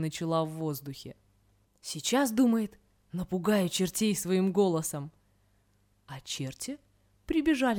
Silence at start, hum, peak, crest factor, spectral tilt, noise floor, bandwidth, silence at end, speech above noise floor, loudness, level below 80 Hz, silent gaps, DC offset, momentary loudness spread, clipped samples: 0 s; 50 Hz at -50 dBFS; -14 dBFS; 18 dB; -5 dB/octave; -69 dBFS; 20 kHz; 0 s; 39 dB; -30 LUFS; -60 dBFS; none; under 0.1%; 19 LU; under 0.1%